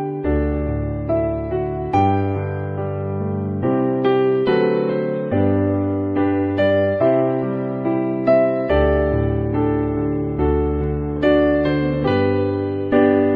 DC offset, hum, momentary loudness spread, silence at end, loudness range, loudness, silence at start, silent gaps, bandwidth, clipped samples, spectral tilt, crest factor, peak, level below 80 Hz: under 0.1%; none; 7 LU; 0 s; 3 LU; -19 LUFS; 0 s; none; 5.2 kHz; under 0.1%; -10 dB/octave; 14 dB; -4 dBFS; -32 dBFS